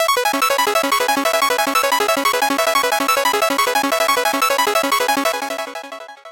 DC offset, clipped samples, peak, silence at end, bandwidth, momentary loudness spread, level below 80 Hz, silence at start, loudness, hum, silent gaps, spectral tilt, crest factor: 0.2%; under 0.1%; -4 dBFS; 0 s; 17 kHz; 7 LU; -62 dBFS; 0 s; -16 LUFS; none; none; 0 dB/octave; 14 dB